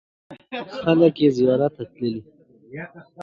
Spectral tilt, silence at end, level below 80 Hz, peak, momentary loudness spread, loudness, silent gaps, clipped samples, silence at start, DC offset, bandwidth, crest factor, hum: -8 dB/octave; 0 s; -60 dBFS; -4 dBFS; 20 LU; -20 LUFS; none; under 0.1%; 0.3 s; under 0.1%; 7.2 kHz; 18 dB; none